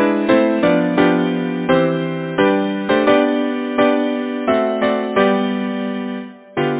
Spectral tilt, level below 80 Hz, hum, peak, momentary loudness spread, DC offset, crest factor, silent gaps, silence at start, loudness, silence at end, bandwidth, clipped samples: -10.5 dB/octave; -54 dBFS; none; 0 dBFS; 8 LU; under 0.1%; 16 dB; none; 0 s; -17 LUFS; 0 s; 4 kHz; under 0.1%